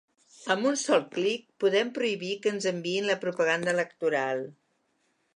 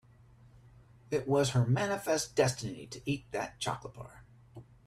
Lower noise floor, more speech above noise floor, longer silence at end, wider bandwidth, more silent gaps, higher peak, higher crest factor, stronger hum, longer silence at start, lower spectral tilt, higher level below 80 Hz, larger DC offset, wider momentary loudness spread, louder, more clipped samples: first, -73 dBFS vs -59 dBFS; first, 45 dB vs 27 dB; first, 0.85 s vs 0.25 s; second, 11 kHz vs 14 kHz; neither; first, -8 dBFS vs -14 dBFS; about the same, 20 dB vs 20 dB; neither; second, 0.4 s vs 0.55 s; second, -3.5 dB/octave vs -5 dB/octave; second, -82 dBFS vs -62 dBFS; neither; second, 5 LU vs 13 LU; first, -28 LUFS vs -32 LUFS; neither